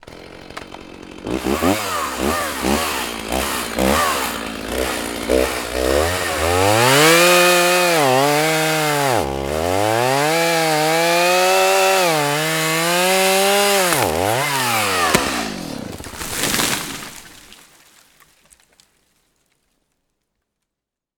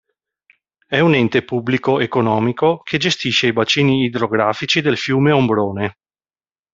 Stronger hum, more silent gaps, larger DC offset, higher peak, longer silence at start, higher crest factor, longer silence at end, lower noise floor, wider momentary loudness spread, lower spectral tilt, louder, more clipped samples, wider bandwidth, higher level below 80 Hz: neither; neither; neither; about the same, 0 dBFS vs -2 dBFS; second, 0.1 s vs 0.9 s; about the same, 18 dB vs 16 dB; first, 3.85 s vs 0.8 s; second, -84 dBFS vs under -90 dBFS; first, 14 LU vs 5 LU; second, -3 dB/octave vs -5.5 dB/octave; about the same, -16 LUFS vs -16 LUFS; neither; first, over 20 kHz vs 7.8 kHz; first, -40 dBFS vs -56 dBFS